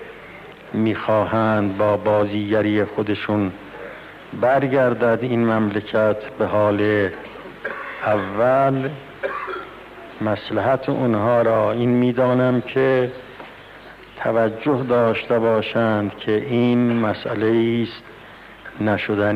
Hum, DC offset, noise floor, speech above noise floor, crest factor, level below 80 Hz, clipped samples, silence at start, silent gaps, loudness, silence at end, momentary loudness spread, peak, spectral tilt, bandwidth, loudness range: none; under 0.1%; -41 dBFS; 23 dB; 12 dB; -56 dBFS; under 0.1%; 0 s; none; -20 LUFS; 0 s; 20 LU; -8 dBFS; -8.5 dB/octave; 6.4 kHz; 2 LU